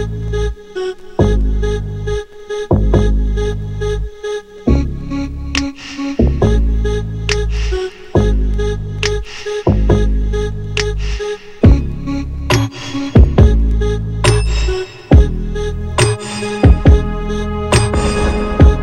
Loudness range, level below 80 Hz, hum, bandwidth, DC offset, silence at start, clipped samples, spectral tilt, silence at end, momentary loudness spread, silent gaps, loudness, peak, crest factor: 4 LU; -16 dBFS; none; 11 kHz; under 0.1%; 0 s; under 0.1%; -6 dB/octave; 0 s; 11 LU; none; -16 LUFS; 0 dBFS; 14 dB